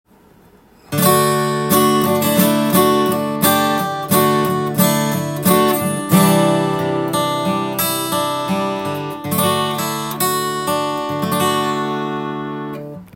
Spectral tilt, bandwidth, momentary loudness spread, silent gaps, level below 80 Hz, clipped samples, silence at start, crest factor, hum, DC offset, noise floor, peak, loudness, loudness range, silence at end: -4.5 dB/octave; 17 kHz; 9 LU; none; -56 dBFS; under 0.1%; 0.9 s; 16 dB; none; under 0.1%; -48 dBFS; 0 dBFS; -16 LUFS; 4 LU; 0.1 s